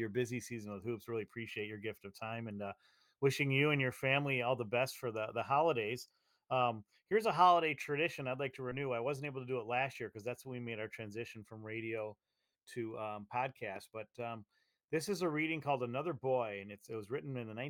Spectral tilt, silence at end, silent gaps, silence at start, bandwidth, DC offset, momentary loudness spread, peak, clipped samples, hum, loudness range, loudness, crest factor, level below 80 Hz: -5.5 dB/octave; 0 s; none; 0 s; 18 kHz; under 0.1%; 13 LU; -16 dBFS; under 0.1%; none; 10 LU; -37 LUFS; 22 dB; -80 dBFS